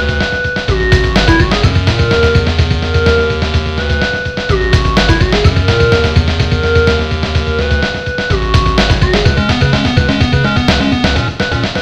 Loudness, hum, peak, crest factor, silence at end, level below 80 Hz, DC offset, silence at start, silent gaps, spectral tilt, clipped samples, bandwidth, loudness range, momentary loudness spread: -12 LUFS; none; 0 dBFS; 12 dB; 0 s; -18 dBFS; under 0.1%; 0 s; none; -6 dB/octave; under 0.1%; 9.4 kHz; 1 LU; 5 LU